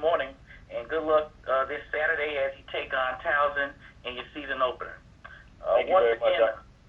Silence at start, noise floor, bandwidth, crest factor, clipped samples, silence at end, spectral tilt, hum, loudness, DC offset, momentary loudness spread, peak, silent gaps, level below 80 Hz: 0 s; -49 dBFS; 6.2 kHz; 18 dB; under 0.1%; 0.25 s; -5.5 dB/octave; none; -27 LUFS; under 0.1%; 15 LU; -10 dBFS; none; -54 dBFS